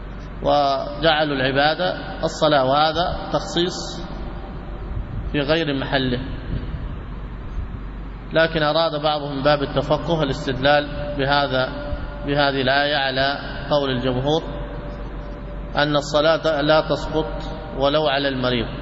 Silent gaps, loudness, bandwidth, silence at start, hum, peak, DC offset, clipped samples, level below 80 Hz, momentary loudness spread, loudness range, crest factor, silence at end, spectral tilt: none; -21 LUFS; 8 kHz; 0 s; none; -4 dBFS; under 0.1%; under 0.1%; -34 dBFS; 15 LU; 5 LU; 16 dB; 0 s; -5.5 dB/octave